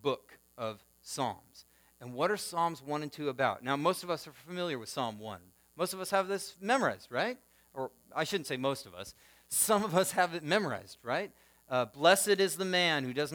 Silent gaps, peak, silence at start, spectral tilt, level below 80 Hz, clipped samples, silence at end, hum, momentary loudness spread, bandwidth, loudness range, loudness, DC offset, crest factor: none; -10 dBFS; 0.05 s; -3 dB/octave; -74 dBFS; under 0.1%; 0 s; none; 17 LU; over 20 kHz; 5 LU; -32 LUFS; under 0.1%; 24 dB